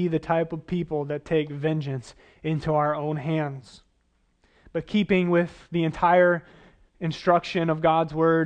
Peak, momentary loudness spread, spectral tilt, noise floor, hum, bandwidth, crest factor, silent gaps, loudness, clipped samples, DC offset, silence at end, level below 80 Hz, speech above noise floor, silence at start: -6 dBFS; 12 LU; -7.5 dB/octave; -68 dBFS; none; 9 kHz; 20 dB; none; -25 LUFS; under 0.1%; under 0.1%; 0 s; -54 dBFS; 43 dB; 0 s